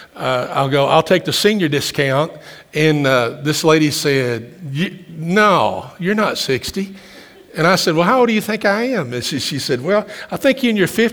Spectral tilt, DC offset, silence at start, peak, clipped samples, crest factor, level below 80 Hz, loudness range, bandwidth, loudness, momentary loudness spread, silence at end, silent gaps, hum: -4.5 dB/octave; under 0.1%; 0 s; 0 dBFS; under 0.1%; 16 dB; -54 dBFS; 2 LU; over 20 kHz; -16 LUFS; 11 LU; 0 s; none; none